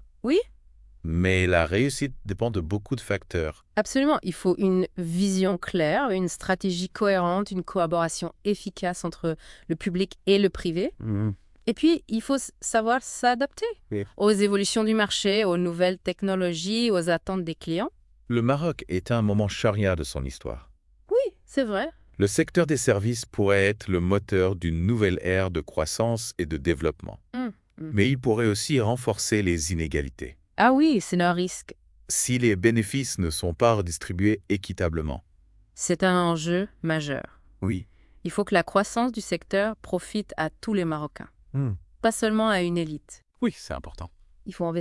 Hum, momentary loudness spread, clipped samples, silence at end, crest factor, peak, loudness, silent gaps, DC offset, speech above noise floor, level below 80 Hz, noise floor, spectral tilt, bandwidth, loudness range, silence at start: none; 10 LU; under 0.1%; 0 s; 20 dB; -4 dBFS; -25 LUFS; none; under 0.1%; 33 dB; -48 dBFS; -58 dBFS; -5 dB/octave; 12 kHz; 3 LU; 0.25 s